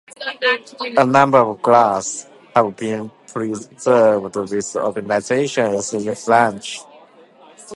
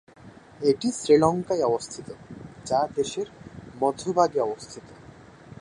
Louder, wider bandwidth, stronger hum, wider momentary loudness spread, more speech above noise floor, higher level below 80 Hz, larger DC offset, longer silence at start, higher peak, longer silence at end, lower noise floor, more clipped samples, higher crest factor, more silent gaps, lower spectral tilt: first, -17 LUFS vs -25 LUFS; about the same, 11.5 kHz vs 11 kHz; neither; second, 13 LU vs 22 LU; first, 29 dB vs 24 dB; about the same, -62 dBFS vs -58 dBFS; neither; about the same, 0.2 s vs 0.25 s; first, 0 dBFS vs -6 dBFS; about the same, 0 s vs 0.05 s; about the same, -47 dBFS vs -48 dBFS; neither; about the same, 18 dB vs 20 dB; neither; about the same, -4.5 dB/octave vs -5 dB/octave